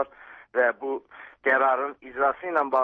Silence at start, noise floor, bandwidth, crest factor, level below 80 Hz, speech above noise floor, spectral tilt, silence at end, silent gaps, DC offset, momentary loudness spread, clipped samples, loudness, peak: 0 s; -49 dBFS; 5.2 kHz; 16 dB; -68 dBFS; 24 dB; -6 dB/octave; 0 s; none; under 0.1%; 11 LU; under 0.1%; -25 LUFS; -10 dBFS